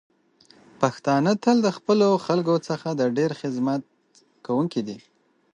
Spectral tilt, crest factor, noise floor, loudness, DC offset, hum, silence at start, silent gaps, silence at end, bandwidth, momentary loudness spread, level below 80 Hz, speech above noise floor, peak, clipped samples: -6.5 dB/octave; 20 dB; -61 dBFS; -23 LUFS; under 0.1%; none; 0.8 s; none; 0.55 s; 10 kHz; 10 LU; -72 dBFS; 39 dB; -4 dBFS; under 0.1%